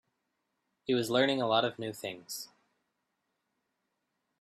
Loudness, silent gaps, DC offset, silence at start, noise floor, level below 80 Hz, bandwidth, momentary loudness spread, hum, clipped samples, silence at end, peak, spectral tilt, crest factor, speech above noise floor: -31 LUFS; none; under 0.1%; 0.9 s; -82 dBFS; -76 dBFS; 15.5 kHz; 15 LU; none; under 0.1%; 1.95 s; -12 dBFS; -4 dB/octave; 22 dB; 52 dB